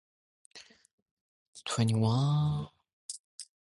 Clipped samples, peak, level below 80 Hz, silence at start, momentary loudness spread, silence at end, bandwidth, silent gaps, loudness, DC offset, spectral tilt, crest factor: under 0.1%; -16 dBFS; -62 dBFS; 0.55 s; 24 LU; 0.2 s; 11.5 kHz; 0.93-1.53 s, 2.93-3.09 s, 3.20-3.38 s; -30 LUFS; under 0.1%; -6 dB/octave; 18 dB